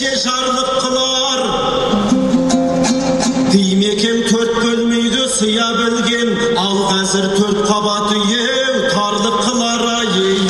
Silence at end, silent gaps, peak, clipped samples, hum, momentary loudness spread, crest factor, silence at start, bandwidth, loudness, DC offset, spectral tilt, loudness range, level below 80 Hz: 0 s; none; 0 dBFS; under 0.1%; none; 2 LU; 14 dB; 0 s; 12 kHz; -14 LUFS; under 0.1%; -3.5 dB/octave; 1 LU; -42 dBFS